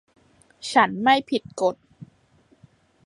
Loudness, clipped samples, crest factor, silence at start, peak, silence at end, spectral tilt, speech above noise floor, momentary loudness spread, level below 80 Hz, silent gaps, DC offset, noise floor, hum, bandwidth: -22 LUFS; under 0.1%; 22 dB; 0.65 s; -4 dBFS; 1 s; -4 dB/octave; 39 dB; 15 LU; -66 dBFS; none; under 0.1%; -60 dBFS; none; 11.5 kHz